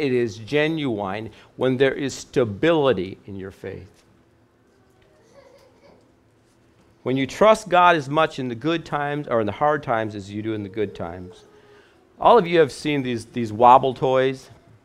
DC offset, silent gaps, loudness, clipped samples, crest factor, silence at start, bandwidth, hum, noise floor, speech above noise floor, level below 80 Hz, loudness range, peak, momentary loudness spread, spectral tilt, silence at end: under 0.1%; none; -21 LUFS; under 0.1%; 22 dB; 0 s; 13 kHz; none; -58 dBFS; 38 dB; -56 dBFS; 7 LU; 0 dBFS; 18 LU; -6 dB/octave; 0.45 s